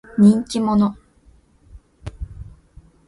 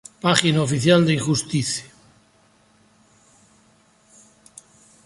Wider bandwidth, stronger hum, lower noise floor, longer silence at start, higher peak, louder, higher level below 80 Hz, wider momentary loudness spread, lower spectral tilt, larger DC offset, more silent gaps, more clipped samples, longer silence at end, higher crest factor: about the same, 11.5 kHz vs 11.5 kHz; neither; second, -53 dBFS vs -58 dBFS; about the same, 0.15 s vs 0.25 s; second, -4 dBFS vs 0 dBFS; about the same, -17 LUFS vs -19 LUFS; first, -42 dBFS vs -58 dBFS; first, 24 LU vs 8 LU; first, -7.5 dB/octave vs -4.5 dB/octave; neither; neither; neither; second, 0.65 s vs 3.2 s; second, 18 dB vs 24 dB